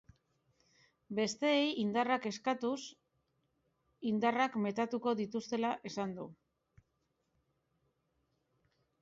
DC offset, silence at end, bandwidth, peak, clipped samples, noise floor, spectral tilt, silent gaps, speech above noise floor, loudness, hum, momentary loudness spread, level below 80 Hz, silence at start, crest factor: under 0.1%; 2.65 s; 7.6 kHz; -20 dBFS; under 0.1%; -81 dBFS; -3.5 dB/octave; none; 47 dB; -35 LUFS; none; 11 LU; -78 dBFS; 1.1 s; 18 dB